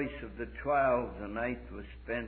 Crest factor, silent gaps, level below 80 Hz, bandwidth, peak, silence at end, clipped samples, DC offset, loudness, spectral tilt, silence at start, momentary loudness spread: 16 dB; none; -48 dBFS; 4.5 kHz; -18 dBFS; 0 s; under 0.1%; under 0.1%; -34 LUFS; -5 dB/octave; 0 s; 15 LU